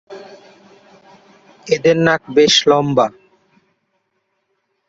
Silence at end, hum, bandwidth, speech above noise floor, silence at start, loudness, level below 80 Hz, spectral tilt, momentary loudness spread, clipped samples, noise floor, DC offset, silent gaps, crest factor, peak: 1.8 s; none; 8 kHz; 55 dB; 0.1 s; -14 LUFS; -58 dBFS; -4 dB/octave; 26 LU; under 0.1%; -69 dBFS; under 0.1%; none; 18 dB; 0 dBFS